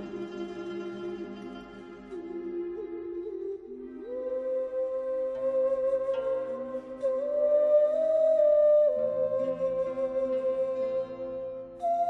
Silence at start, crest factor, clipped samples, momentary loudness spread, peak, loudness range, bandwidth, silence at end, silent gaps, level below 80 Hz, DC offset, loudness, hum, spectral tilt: 0 s; 14 dB; under 0.1%; 16 LU; -14 dBFS; 13 LU; 6.2 kHz; 0 s; none; -64 dBFS; under 0.1%; -29 LUFS; none; -7.5 dB/octave